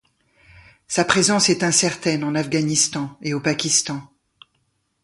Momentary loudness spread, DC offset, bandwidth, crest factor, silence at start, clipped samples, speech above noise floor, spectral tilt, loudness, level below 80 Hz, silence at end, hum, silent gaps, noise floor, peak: 10 LU; under 0.1%; 11.5 kHz; 20 dB; 0.9 s; under 0.1%; 49 dB; -3 dB/octave; -19 LUFS; -58 dBFS; 1 s; none; none; -69 dBFS; -2 dBFS